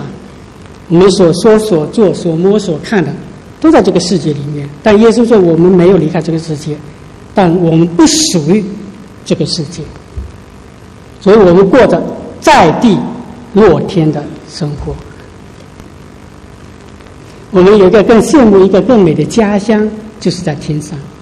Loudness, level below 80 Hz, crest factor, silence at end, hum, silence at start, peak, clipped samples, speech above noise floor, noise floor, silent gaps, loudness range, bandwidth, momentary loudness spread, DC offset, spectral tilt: -9 LUFS; -34 dBFS; 10 dB; 0.15 s; none; 0 s; 0 dBFS; 1%; 25 dB; -33 dBFS; none; 7 LU; 12.5 kHz; 17 LU; under 0.1%; -6 dB/octave